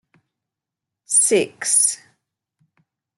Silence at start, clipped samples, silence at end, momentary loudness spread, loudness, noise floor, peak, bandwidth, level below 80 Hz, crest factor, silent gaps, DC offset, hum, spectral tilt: 1.1 s; under 0.1%; 1.2 s; 5 LU; -16 LUFS; -85 dBFS; -6 dBFS; 12.5 kHz; -72 dBFS; 18 dB; none; under 0.1%; none; -1 dB/octave